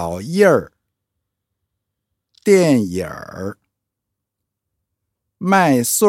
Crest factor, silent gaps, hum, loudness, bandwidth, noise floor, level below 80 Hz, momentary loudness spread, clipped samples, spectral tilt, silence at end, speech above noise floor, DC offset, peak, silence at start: 18 dB; none; none; -16 LUFS; 16.5 kHz; -80 dBFS; -56 dBFS; 16 LU; under 0.1%; -5 dB/octave; 0 s; 65 dB; under 0.1%; 0 dBFS; 0 s